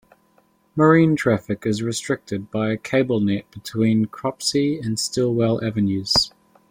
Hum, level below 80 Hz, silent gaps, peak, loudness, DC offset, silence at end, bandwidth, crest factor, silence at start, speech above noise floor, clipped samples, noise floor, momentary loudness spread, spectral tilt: none; -54 dBFS; none; -2 dBFS; -21 LUFS; under 0.1%; 0.4 s; 16.5 kHz; 18 dB; 0.75 s; 40 dB; under 0.1%; -60 dBFS; 10 LU; -5 dB/octave